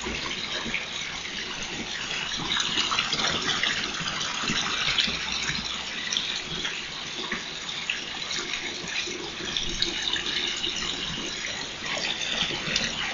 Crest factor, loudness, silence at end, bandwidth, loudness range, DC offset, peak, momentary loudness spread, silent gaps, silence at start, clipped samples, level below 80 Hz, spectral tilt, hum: 22 dB; -27 LUFS; 0 s; 8 kHz; 4 LU; under 0.1%; -8 dBFS; 7 LU; none; 0 s; under 0.1%; -50 dBFS; -1 dB/octave; none